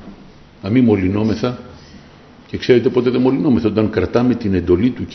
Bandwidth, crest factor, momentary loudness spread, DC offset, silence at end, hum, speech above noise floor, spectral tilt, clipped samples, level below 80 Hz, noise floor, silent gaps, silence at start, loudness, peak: 6.2 kHz; 16 dB; 10 LU; under 0.1%; 0 s; none; 27 dB; -8 dB/octave; under 0.1%; -44 dBFS; -42 dBFS; none; 0 s; -16 LUFS; 0 dBFS